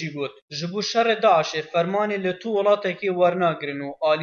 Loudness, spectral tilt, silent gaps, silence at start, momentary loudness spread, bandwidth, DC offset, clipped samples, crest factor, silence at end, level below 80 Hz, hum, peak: -22 LUFS; -5 dB/octave; 0.42-0.48 s; 0 s; 11 LU; 7.2 kHz; under 0.1%; under 0.1%; 16 dB; 0 s; -72 dBFS; none; -6 dBFS